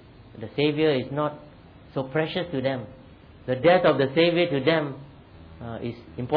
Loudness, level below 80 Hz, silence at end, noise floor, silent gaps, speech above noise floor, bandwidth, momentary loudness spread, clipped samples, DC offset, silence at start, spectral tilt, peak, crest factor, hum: -24 LUFS; -56 dBFS; 0 s; -47 dBFS; none; 23 dB; 5 kHz; 21 LU; under 0.1%; under 0.1%; 0.2 s; -9.5 dB/octave; -8 dBFS; 18 dB; none